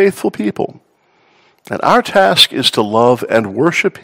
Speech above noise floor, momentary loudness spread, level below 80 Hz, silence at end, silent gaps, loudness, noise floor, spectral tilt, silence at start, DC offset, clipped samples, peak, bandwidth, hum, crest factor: 42 dB; 11 LU; -56 dBFS; 0.05 s; none; -12 LUFS; -55 dBFS; -4 dB/octave; 0 s; under 0.1%; 0.6%; 0 dBFS; over 20 kHz; none; 14 dB